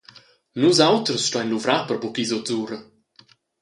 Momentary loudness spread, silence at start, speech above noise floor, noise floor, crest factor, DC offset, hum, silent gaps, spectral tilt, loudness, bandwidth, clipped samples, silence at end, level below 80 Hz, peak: 14 LU; 0.55 s; 34 dB; -55 dBFS; 20 dB; under 0.1%; none; none; -4 dB/octave; -21 LUFS; 11.5 kHz; under 0.1%; 0.8 s; -68 dBFS; -2 dBFS